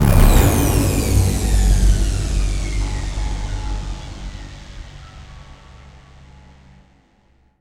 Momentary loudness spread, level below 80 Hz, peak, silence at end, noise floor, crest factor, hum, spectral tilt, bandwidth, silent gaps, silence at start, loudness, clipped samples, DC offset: 23 LU; -20 dBFS; 0 dBFS; 1.7 s; -56 dBFS; 18 dB; none; -5.5 dB/octave; 16 kHz; none; 0 s; -19 LUFS; under 0.1%; under 0.1%